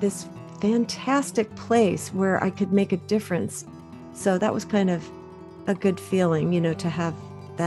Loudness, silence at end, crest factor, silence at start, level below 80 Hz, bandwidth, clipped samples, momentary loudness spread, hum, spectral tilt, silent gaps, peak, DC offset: -24 LUFS; 0 s; 16 dB; 0 s; -60 dBFS; 12.5 kHz; under 0.1%; 17 LU; none; -6 dB/octave; none; -8 dBFS; under 0.1%